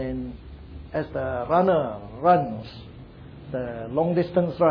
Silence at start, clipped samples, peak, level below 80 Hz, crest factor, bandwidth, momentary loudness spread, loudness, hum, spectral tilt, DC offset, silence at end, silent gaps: 0 s; under 0.1%; -6 dBFS; -46 dBFS; 20 dB; 5.2 kHz; 22 LU; -25 LUFS; none; -10 dB/octave; under 0.1%; 0 s; none